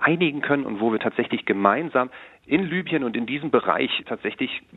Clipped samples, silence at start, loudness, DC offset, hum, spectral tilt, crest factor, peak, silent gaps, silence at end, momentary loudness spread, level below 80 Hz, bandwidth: under 0.1%; 0 s; -23 LUFS; under 0.1%; none; -8.5 dB/octave; 22 dB; 0 dBFS; none; 0 s; 7 LU; -66 dBFS; 4.1 kHz